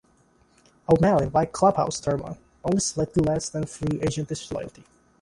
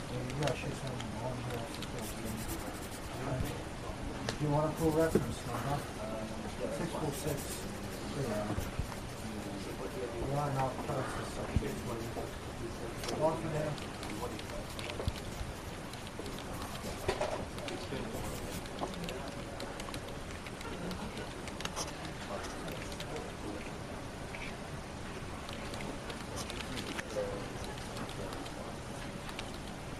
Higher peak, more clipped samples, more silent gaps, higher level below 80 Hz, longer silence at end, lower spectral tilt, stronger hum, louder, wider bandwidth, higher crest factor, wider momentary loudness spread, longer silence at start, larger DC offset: first, -6 dBFS vs -14 dBFS; neither; neither; about the same, -48 dBFS vs -50 dBFS; first, 0.55 s vs 0 s; about the same, -5.5 dB/octave vs -5 dB/octave; neither; first, -24 LUFS vs -39 LUFS; second, 11.5 kHz vs 15.5 kHz; about the same, 20 dB vs 24 dB; first, 13 LU vs 8 LU; first, 0.9 s vs 0 s; neither